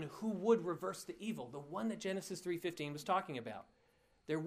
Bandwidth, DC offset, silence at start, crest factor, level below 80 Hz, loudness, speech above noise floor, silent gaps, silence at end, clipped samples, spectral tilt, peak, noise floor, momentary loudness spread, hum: 15.5 kHz; under 0.1%; 0 s; 20 dB; -78 dBFS; -40 LUFS; 33 dB; none; 0 s; under 0.1%; -5.5 dB/octave; -20 dBFS; -73 dBFS; 12 LU; none